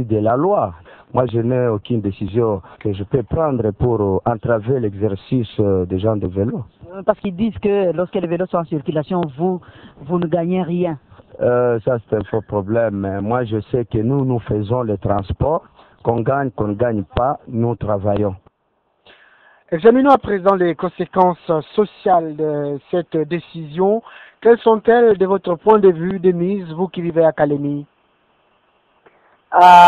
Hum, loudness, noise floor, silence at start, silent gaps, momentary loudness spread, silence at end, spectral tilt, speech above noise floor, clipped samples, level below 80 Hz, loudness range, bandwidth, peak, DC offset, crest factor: none; -18 LUFS; -65 dBFS; 0 s; none; 9 LU; 0 s; -8.5 dB/octave; 49 dB; under 0.1%; -44 dBFS; 5 LU; 8.6 kHz; 0 dBFS; under 0.1%; 18 dB